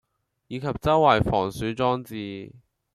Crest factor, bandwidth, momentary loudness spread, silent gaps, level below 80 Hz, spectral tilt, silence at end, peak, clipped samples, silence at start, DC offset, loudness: 20 dB; 15 kHz; 17 LU; none; -46 dBFS; -6.5 dB/octave; 0.35 s; -4 dBFS; under 0.1%; 0.5 s; under 0.1%; -24 LUFS